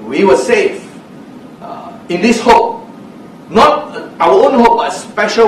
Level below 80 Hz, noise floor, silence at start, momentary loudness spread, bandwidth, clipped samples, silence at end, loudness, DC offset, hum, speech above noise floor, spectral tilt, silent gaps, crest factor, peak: -42 dBFS; -33 dBFS; 0 s; 20 LU; 13.5 kHz; 0.4%; 0 s; -11 LUFS; under 0.1%; none; 23 dB; -4.5 dB/octave; none; 12 dB; 0 dBFS